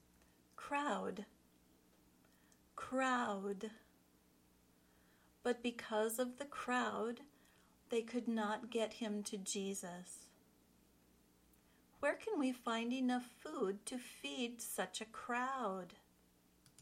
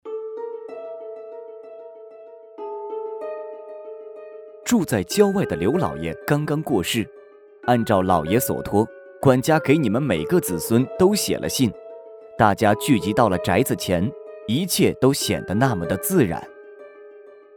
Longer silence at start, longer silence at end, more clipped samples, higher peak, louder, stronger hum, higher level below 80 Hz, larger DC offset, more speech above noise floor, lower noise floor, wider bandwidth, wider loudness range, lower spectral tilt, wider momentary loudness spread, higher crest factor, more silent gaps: first, 0.6 s vs 0.05 s; second, 0 s vs 0.35 s; neither; second, -26 dBFS vs -2 dBFS; second, -42 LUFS vs -21 LUFS; first, 60 Hz at -80 dBFS vs none; second, -80 dBFS vs -50 dBFS; neither; first, 31 dB vs 27 dB; first, -72 dBFS vs -46 dBFS; second, 16.5 kHz vs over 20 kHz; second, 3 LU vs 14 LU; second, -3.5 dB/octave vs -5.5 dB/octave; second, 12 LU vs 20 LU; about the same, 18 dB vs 20 dB; neither